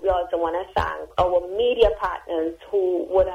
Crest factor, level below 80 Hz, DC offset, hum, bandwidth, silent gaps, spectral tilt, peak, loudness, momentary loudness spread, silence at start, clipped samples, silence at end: 18 dB; -40 dBFS; under 0.1%; none; 11.5 kHz; none; -6.5 dB/octave; -4 dBFS; -23 LUFS; 7 LU; 0 s; under 0.1%; 0 s